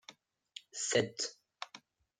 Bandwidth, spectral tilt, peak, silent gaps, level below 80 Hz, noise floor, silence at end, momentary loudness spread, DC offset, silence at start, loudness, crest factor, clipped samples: 9.8 kHz; -2.5 dB/octave; -16 dBFS; none; -82 dBFS; -60 dBFS; 0.45 s; 22 LU; under 0.1%; 0.1 s; -35 LUFS; 24 dB; under 0.1%